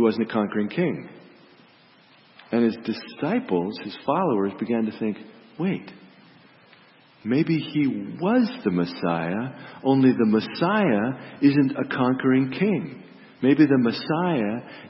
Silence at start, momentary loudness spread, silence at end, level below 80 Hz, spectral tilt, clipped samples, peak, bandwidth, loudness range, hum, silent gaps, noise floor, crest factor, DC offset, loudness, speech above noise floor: 0 s; 12 LU; 0 s; -68 dBFS; -11.5 dB/octave; under 0.1%; -6 dBFS; 5.8 kHz; 7 LU; none; none; -55 dBFS; 18 dB; under 0.1%; -23 LUFS; 32 dB